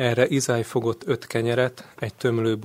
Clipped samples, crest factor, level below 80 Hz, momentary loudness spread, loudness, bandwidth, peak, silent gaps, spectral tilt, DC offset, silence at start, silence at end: under 0.1%; 20 dB; -60 dBFS; 7 LU; -24 LUFS; 16 kHz; -2 dBFS; none; -5.5 dB/octave; under 0.1%; 0 s; 0 s